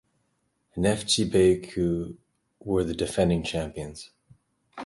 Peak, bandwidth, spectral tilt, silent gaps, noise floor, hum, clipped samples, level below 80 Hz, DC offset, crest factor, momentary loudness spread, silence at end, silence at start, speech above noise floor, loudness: -8 dBFS; 11.5 kHz; -5 dB/octave; none; -73 dBFS; none; under 0.1%; -46 dBFS; under 0.1%; 18 dB; 18 LU; 0 s; 0.75 s; 48 dB; -25 LUFS